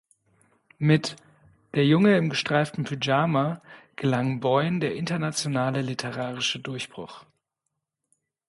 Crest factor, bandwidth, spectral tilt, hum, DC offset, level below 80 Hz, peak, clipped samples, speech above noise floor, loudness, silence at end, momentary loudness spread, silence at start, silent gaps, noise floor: 18 dB; 11.5 kHz; -5.5 dB/octave; none; under 0.1%; -66 dBFS; -8 dBFS; under 0.1%; 57 dB; -25 LUFS; 1.3 s; 14 LU; 0.8 s; none; -82 dBFS